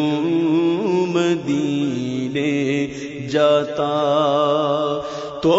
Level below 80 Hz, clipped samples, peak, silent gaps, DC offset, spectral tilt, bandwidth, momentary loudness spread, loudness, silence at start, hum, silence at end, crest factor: -56 dBFS; under 0.1%; -4 dBFS; none; under 0.1%; -6 dB/octave; 7.8 kHz; 6 LU; -19 LUFS; 0 s; none; 0 s; 14 dB